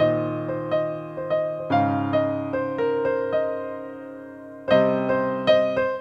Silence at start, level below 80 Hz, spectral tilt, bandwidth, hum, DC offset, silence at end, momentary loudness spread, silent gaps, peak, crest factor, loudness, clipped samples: 0 s; -60 dBFS; -8 dB/octave; 6.2 kHz; none; under 0.1%; 0 s; 15 LU; none; -6 dBFS; 18 dB; -23 LUFS; under 0.1%